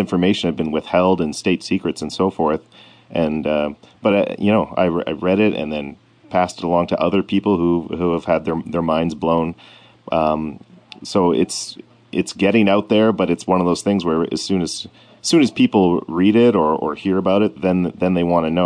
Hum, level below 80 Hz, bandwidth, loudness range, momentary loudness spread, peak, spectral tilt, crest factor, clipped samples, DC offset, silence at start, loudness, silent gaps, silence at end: none; -50 dBFS; 10 kHz; 4 LU; 9 LU; -4 dBFS; -6 dB/octave; 14 dB; under 0.1%; under 0.1%; 0 s; -18 LUFS; none; 0 s